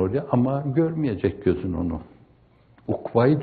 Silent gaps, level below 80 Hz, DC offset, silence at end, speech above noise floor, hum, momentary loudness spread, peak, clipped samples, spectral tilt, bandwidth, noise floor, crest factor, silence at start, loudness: none; -50 dBFS; under 0.1%; 0 s; 34 dB; none; 9 LU; -6 dBFS; under 0.1%; -8.5 dB/octave; 4.7 kHz; -56 dBFS; 18 dB; 0 s; -24 LUFS